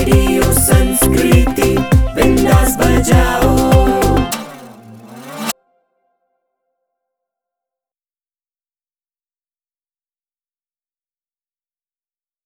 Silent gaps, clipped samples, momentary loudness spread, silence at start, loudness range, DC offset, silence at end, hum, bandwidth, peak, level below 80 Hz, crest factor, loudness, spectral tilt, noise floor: none; under 0.1%; 13 LU; 0 s; 20 LU; under 0.1%; 6.95 s; none; over 20 kHz; 0 dBFS; -22 dBFS; 16 dB; -12 LUFS; -5.5 dB/octave; under -90 dBFS